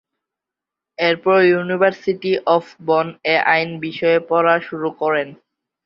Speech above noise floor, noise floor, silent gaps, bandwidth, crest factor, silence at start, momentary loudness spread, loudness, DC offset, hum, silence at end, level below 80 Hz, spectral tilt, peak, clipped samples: 68 dB; -86 dBFS; none; 6.8 kHz; 16 dB; 1 s; 8 LU; -17 LUFS; under 0.1%; none; 0.5 s; -66 dBFS; -7 dB/octave; -2 dBFS; under 0.1%